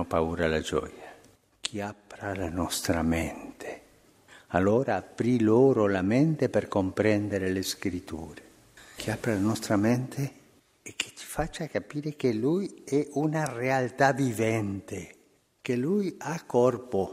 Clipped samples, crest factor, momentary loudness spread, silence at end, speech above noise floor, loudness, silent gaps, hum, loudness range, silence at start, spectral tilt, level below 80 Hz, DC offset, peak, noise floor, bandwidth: under 0.1%; 20 dB; 15 LU; 0 s; 32 dB; -28 LUFS; none; none; 6 LU; 0 s; -6 dB/octave; -52 dBFS; under 0.1%; -8 dBFS; -59 dBFS; 15.5 kHz